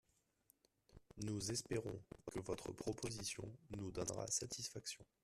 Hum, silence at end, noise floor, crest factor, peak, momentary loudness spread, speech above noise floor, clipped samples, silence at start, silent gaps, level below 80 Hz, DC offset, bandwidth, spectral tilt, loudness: none; 0.2 s; -78 dBFS; 20 dB; -28 dBFS; 9 LU; 32 dB; under 0.1%; 0.9 s; none; -68 dBFS; under 0.1%; 14 kHz; -3.5 dB/octave; -46 LUFS